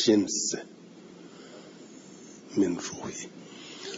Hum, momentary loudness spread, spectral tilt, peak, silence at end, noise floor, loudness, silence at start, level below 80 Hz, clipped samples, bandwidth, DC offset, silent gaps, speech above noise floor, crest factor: none; 21 LU; -3.5 dB/octave; -10 dBFS; 0 s; -49 dBFS; -29 LUFS; 0 s; -74 dBFS; under 0.1%; 7.8 kHz; under 0.1%; none; 21 dB; 22 dB